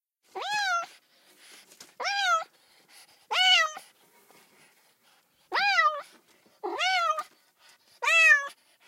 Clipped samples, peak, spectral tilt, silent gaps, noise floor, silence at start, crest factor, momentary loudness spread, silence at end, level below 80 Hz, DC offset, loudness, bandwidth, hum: under 0.1%; -8 dBFS; 2 dB/octave; none; -65 dBFS; 0.35 s; 20 dB; 21 LU; 0.35 s; under -90 dBFS; under 0.1%; -24 LUFS; 16 kHz; none